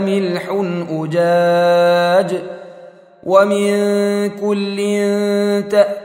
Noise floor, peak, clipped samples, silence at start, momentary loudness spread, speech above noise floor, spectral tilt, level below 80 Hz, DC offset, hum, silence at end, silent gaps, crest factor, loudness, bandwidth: -40 dBFS; 0 dBFS; under 0.1%; 0 s; 9 LU; 25 dB; -6 dB/octave; -68 dBFS; under 0.1%; none; 0 s; none; 16 dB; -15 LUFS; 16 kHz